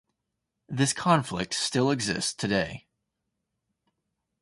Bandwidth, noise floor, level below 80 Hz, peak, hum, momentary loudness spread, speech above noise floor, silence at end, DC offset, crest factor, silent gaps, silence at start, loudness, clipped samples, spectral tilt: 11.5 kHz; -83 dBFS; -58 dBFS; -8 dBFS; none; 9 LU; 56 dB; 1.6 s; under 0.1%; 22 dB; none; 0.7 s; -26 LUFS; under 0.1%; -4 dB/octave